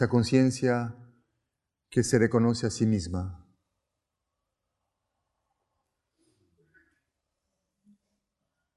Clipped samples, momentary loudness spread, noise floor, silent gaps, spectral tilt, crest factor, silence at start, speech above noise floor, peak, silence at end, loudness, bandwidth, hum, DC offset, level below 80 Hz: under 0.1%; 12 LU; -85 dBFS; none; -6 dB/octave; 22 dB; 0 s; 59 dB; -8 dBFS; 5.4 s; -26 LUFS; 12 kHz; none; under 0.1%; -52 dBFS